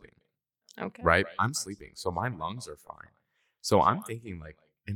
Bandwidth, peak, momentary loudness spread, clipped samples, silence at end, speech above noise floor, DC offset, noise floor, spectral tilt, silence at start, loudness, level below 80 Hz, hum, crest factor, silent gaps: 18 kHz; -6 dBFS; 22 LU; under 0.1%; 0 s; 48 dB; under 0.1%; -78 dBFS; -4.5 dB/octave; 0.75 s; -29 LUFS; -54 dBFS; none; 26 dB; none